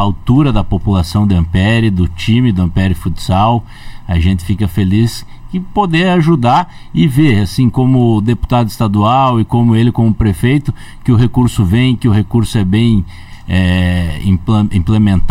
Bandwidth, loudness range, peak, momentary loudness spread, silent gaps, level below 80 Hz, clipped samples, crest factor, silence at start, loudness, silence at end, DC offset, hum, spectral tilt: 15.5 kHz; 2 LU; 0 dBFS; 6 LU; none; -26 dBFS; under 0.1%; 12 dB; 0 s; -12 LUFS; 0 s; under 0.1%; none; -7.5 dB/octave